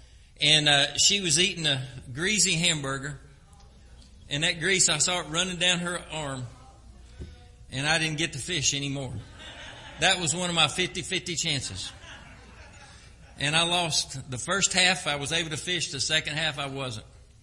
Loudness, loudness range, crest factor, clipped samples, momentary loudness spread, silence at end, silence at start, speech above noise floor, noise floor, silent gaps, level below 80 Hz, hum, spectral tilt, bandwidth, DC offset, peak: -24 LUFS; 5 LU; 24 dB; under 0.1%; 18 LU; 0.2 s; 0.15 s; 25 dB; -52 dBFS; none; -52 dBFS; none; -2 dB/octave; 11.5 kHz; under 0.1%; -4 dBFS